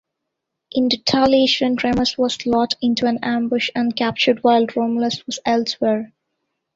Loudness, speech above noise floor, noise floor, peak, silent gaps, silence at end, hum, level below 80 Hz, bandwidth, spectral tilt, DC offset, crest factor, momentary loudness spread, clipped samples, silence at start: -18 LUFS; 61 dB; -79 dBFS; -2 dBFS; none; 0.7 s; none; -54 dBFS; 7.8 kHz; -4 dB/octave; under 0.1%; 16 dB; 6 LU; under 0.1%; 0.75 s